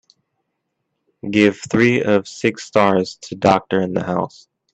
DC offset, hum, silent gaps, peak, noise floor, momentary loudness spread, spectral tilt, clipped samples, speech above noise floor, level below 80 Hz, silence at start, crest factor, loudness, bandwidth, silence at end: under 0.1%; none; none; 0 dBFS; -74 dBFS; 8 LU; -6 dB/octave; under 0.1%; 57 dB; -58 dBFS; 1.25 s; 18 dB; -18 LUFS; 8.6 kHz; 0.45 s